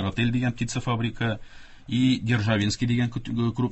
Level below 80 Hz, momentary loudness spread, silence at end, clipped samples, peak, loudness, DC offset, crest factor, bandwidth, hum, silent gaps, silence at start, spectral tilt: -46 dBFS; 6 LU; 0 s; under 0.1%; -10 dBFS; -25 LUFS; under 0.1%; 16 dB; 8.4 kHz; none; none; 0 s; -6 dB/octave